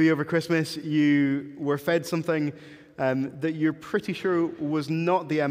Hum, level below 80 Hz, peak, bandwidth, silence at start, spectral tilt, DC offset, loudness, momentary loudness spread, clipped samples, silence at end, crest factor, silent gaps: none; -70 dBFS; -10 dBFS; 16 kHz; 0 s; -6.5 dB/octave; under 0.1%; -26 LUFS; 7 LU; under 0.1%; 0 s; 14 dB; none